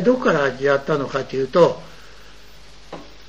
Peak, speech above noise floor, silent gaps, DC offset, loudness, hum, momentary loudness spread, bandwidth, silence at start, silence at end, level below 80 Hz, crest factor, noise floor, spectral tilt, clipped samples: -4 dBFS; 27 dB; none; 0.9%; -19 LUFS; none; 22 LU; 8.2 kHz; 0 s; 0.25 s; -50 dBFS; 18 dB; -46 dBFS; -6 dB/octave; under 0.1%